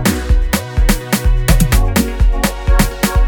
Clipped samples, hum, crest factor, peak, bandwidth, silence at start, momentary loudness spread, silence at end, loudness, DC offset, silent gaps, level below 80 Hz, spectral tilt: under 0.1%; none; 12 dB; 0 dBFS; 19 kHz; 0 s; 3 LU; 0 s; -15 LUFS; under 0.1%; none; -14 dBFS; -5 dB/octave